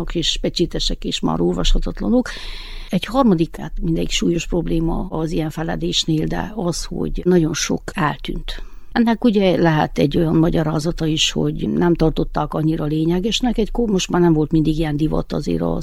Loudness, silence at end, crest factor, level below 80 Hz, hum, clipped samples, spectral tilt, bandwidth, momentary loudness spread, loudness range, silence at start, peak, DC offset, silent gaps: -19 LUFS; 0 s; 16 dB; -28 dBFS; none; under 0.1%; -5.5 dB/octave; 14.5 kHz; 8 LU; 3 LU; 0 s; -2 dBFS; under 0.1%; none